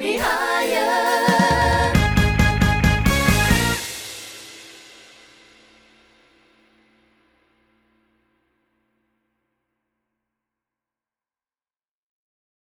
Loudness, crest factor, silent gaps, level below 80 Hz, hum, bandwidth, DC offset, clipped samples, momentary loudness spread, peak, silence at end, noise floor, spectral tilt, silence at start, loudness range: -18 LUFS; 22 dB; none; -32 dBFS; none; over 20 kHz; under 0.1%; under 0.1%; 18 LU; -2 dBFS; 7.9 s; under -90 dBFS; -4.5 dB/octave; 0 s; 16 LU